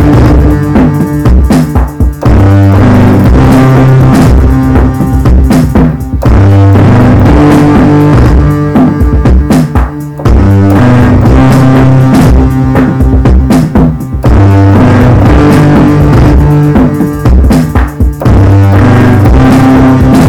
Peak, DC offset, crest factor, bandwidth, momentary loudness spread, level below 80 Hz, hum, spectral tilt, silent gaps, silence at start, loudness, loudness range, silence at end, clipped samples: 0 dBFS; under 0.1%; 4 dB; 16 kHz; 5 LU; -10 dBFS; none; -8.5 dB/octave; none; 0 s; -5 LUFS; 1 LU; 0 s; 0.7%